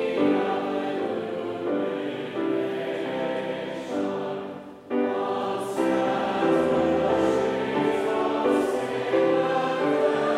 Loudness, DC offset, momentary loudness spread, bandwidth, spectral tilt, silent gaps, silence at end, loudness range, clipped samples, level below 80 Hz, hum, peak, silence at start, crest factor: -25 LUFS; under 0.1%; 8 LU; 13.5 kHz; -6 dB/octave; none; 0 s; 5 LU; under 0.1%; -62 dBFS; none; -10 dBFS; 0 s; 14 dB